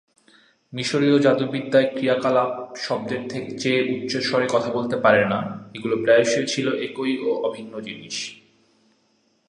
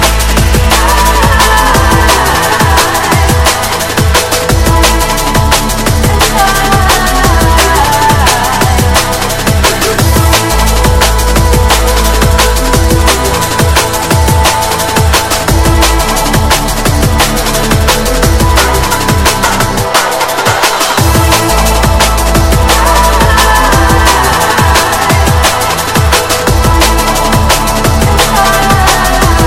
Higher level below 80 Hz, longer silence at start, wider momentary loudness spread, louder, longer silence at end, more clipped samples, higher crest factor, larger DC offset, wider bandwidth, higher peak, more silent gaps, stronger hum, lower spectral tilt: second, -66 dBFS vs -14 dBFS; first, 0.7 s vs 0 s; first, 13 LU vs 3 LU; second, -22 LUFS vs -8 LUFS; first, 1.15 s vs 0 s; second, under 0.1% vs 0.9%; first, 20 dB vs 8 dB; second, under 0.1% vs 2%; second, 10.5 kHz vs 17.5 kHz; about the same, -2 dBFS vs 0 dBFS; neither; neither; about the same, -4.5 dB/octave vs -3.5 dB/octave